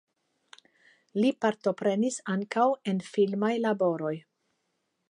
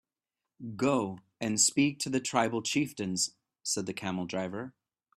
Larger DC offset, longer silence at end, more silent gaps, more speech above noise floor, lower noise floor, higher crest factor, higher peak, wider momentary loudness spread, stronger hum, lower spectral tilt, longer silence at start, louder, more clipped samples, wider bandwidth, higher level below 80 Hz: neither; first, 0.9 s vs 0.45 s; neither; second, 51 dB vs 59 dB; second, -78 dBFS vs -90 dBFS; about the same, 18 dB vs 22 dB; about the same, -12 dBFS vs -10 dBFS; second, 7 LU vs 14 LU; neither; first, -6 dB/octave vs -3 dB/octave; first, 1.15 s vs 0.6 s; about the same, -28 LUFS vs -30 LUFS; neither; second, 11 kHz vs 15 kHz; second, -82 dBFS vs -70 dBFS